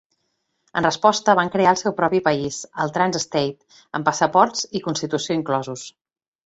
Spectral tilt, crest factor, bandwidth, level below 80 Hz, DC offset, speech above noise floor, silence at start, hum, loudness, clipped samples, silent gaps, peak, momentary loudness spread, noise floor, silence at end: -4 dB/octave; 20 dB; 8.2 kHz; -60 dBFS; under 0.1%; 52 dB; 0.75 s; none; -20 LUFS; under 0.1%; none; -2 dBFS; 11 LU; -73 dBFS; 0.55 s